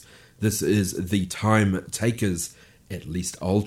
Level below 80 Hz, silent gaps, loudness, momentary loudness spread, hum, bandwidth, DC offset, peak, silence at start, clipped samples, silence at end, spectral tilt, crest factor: -50 dBFS; none; -25 LUFS; 11 LU; none; 16 kHz; under 0.1%; -6 dBFS; 0.4 s; under 0.1%; 0 s; -5.5 dB/octave; 18 dB